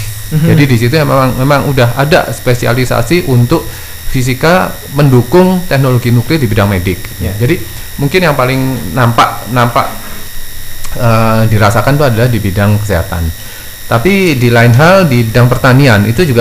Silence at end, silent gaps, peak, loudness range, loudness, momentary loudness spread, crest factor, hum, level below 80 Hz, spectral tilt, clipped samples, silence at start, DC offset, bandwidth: 0 s; none; 0 dBFS; 3 LU; -9 LUFS; 12 LU; 8 dB; none; -24 dBFS; -6 dB/octave; 1%; 0 s; 2%; 16 kHz